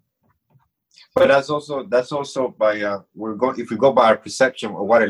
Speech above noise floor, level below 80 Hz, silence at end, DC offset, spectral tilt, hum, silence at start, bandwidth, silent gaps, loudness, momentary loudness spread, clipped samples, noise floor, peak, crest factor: 49 dB; -62 dBFS; 0 s; under 0.1%; -4.5 dB/octave; none; 1.15 s; 11.5 kHz; none; -19 LUFS; 11 LU; under 0.1%; -67 dBFS; -2 dBFS; 16 dB